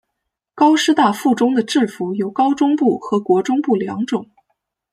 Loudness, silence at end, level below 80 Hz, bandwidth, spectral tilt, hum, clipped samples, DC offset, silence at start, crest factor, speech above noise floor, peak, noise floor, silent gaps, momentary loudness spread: -17 LUFS; 0.7 s; -66 dBFS; 14.5 kHz; -5 dB/octave; none; under 0.1%; under 0.1%; 0.55 s; 16 dB; 62 dB; -2 dBFS; -78 dBFS; none; 8 LU